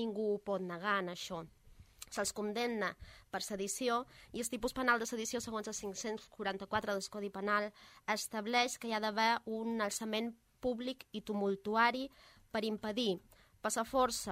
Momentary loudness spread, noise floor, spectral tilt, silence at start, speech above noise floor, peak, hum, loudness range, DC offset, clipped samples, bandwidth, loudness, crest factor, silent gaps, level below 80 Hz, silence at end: 11 LU; -57 dBFS; -3 dB/octave; 0 s; 20 dB; -16 dBFS; none; 3 LU; under 0.1%; under 0.1%; 16 kHz; -37 LUFS; 20 dB; none; -66 dBFS; 0 s